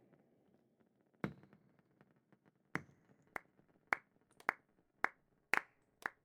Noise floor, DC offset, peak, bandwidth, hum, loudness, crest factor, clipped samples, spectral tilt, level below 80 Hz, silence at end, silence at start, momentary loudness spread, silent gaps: -76 dBFS; under 0.1%; -14 dBFS; 16 kHz; none; -43 LUFS; 34 dB; under 0.1%; -4 dB/octave; -82 dBFS; 0.15 s; 1.25 s; 13 LU; none